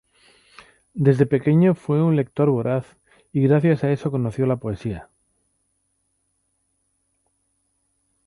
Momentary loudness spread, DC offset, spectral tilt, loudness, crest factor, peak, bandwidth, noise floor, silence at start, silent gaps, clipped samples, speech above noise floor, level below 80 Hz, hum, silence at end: 11 LU; under 0.1%; -9.5 dB/octave; -20 LUFS; 20 dB; -4 dBFS; 11 kHz; -71 dBFS; 0.95 s; none; under 0.1%; 52 dB; -54 dBFS; none; 3.25 s